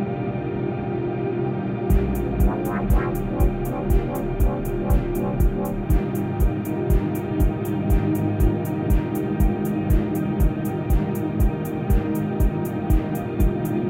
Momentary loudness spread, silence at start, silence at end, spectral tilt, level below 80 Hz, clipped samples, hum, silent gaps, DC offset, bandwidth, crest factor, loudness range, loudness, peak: 4 LU; 0 s; 0 s; -8.5 dB/octave; -24 dBFS; under 0.1%; none; none; under 0.1%; 16.5 kHz; 14 dB; 1 LU; -23 LUFS; -6 dBFS